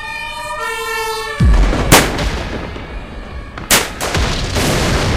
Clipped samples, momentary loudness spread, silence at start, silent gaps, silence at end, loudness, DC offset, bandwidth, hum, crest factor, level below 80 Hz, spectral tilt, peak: 0.2%; 19 LU; 0 s; none; 0 s; -15 LUFS; 0.4%; 16 kHz; none; 16 dB; -20 dBFS; -3.5 dB/octave; 0 dBFS